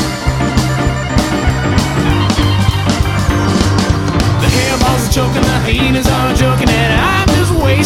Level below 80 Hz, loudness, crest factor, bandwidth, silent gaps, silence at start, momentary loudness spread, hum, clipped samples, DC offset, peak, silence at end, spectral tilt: -20 dBFS; -12 LUFS; 12 dB; 16.5 kHz; none; 0 s; 3 LU; none; under 0.1%; under 0.1%; 0 dBFS; 0 s; -5 dB/octave